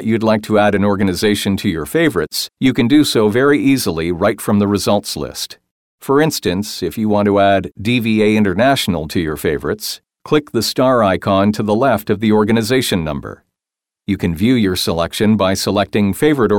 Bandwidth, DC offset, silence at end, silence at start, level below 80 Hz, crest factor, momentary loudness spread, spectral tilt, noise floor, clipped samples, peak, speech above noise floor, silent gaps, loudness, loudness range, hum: 18 kHz; 0.2%; 0 s; 0 s; -44 dBFS; 12 dB; 8 LU; -5.5 dB/octave; -87 dBFS; under 0.1%; -2 dBFS; 72 dB; 5.71-5.98 s; -15 LUFS; 2 LU; none